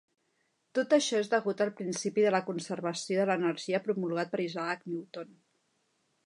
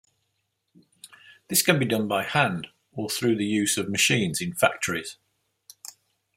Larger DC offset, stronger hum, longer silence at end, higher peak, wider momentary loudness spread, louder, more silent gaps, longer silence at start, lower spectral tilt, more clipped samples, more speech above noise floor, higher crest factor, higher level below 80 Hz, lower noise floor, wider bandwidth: neither; neither; first, 1 s vs 0.5 s; second, -12 dBFS vs -4 dBFS; second, 10 LU vs 19 LU; second, -31 LUFS vs -24 LUFS; neither; second, 0.75 s vs 1.05 s; about the same, -4.5 dB/octave vs -3.5 dB/octave; neither; second, 45 dB vs 52 dB; about the same, 20 dB vs 24 dB; second, -86 dBFS vs -66 dBFS; about the same, -76 dBFS vs -76 dBFS; second, 11 kHz vs 16 kHz